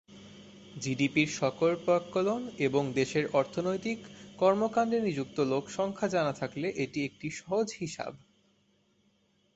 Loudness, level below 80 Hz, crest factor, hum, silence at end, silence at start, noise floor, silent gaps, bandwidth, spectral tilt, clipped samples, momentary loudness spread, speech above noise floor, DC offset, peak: -31 LUFS; -68 dBFS; 20 dB; none; 1.4 s; 0.1 s; -70 dBFS; none; 8.2 kHz; -5.5 dB/octave; under 0.1%; 12 LU; 40 dB; under 0.1%; -12 dBFS